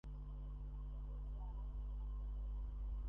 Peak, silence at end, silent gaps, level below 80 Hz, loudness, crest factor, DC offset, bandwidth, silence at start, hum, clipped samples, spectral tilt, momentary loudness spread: -38 dBFS; 0 s; none; -46 dBFS; -50 LUFS; 8 dB; under 0.1%; 3.3 kHz; 0.05 s; 50 Hz at -45 dBFS; under 0.1%; -9.5 dB/octave; 3 LU